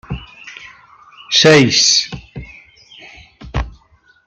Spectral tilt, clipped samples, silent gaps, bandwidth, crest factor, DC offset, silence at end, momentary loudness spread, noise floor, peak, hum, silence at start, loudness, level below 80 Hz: -3 dB/octave; under 0.1%; none; 11 kHz; 18 dB; under 0.1%; 0.55 s; 25 LU; -52 dBFS; 0 dBFS; none; 0.1 s; -11 LUFS; -34 dBFS